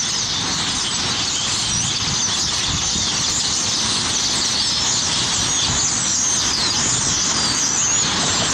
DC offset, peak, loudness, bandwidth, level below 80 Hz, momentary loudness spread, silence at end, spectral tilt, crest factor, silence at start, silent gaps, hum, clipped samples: under 0.1%; -8 dBFS; -17 LUFS; 16 kHz; -40 dBFS; 3 LU; 0 s; -0.5 dB/octave; 12 dB; 0 s; none; none; under 0.1%